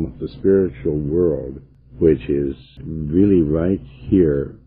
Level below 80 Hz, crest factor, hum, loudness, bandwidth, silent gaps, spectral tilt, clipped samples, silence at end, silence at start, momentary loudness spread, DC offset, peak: -36 dBFS; 16 dB; none; -19 LUFS; 4.7 kHz; none; -12.5 dB/octave; under 0.1%; 0.1 s; 0 s; 12 LU; under 0.1%; -2 dBFS